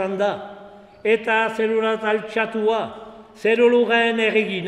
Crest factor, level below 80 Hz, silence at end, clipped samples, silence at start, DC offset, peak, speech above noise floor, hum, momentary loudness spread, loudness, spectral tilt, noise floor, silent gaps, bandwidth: 14 dB; -64 dBFS; 0 s; under 0.1%; 0 s; under 0.1%; -6 dBFS; 23 dB; none; 12 LU; -20 LUFS; -5 dB/octave; -43 dBFS; none; 9.8 kHz